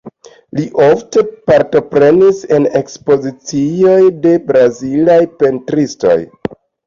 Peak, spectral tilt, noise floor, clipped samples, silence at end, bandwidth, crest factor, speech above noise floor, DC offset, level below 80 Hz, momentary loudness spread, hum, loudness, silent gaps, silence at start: 0 dBFS; -6.5 dB/octave; -36 dBFS; under 0.1%; 0.35 s; 7.4 kHz; 10 dB; 26 dB; under 0.1%; -50 dBFS; 9 LU; none; -11 LUFS; none; 0.05 s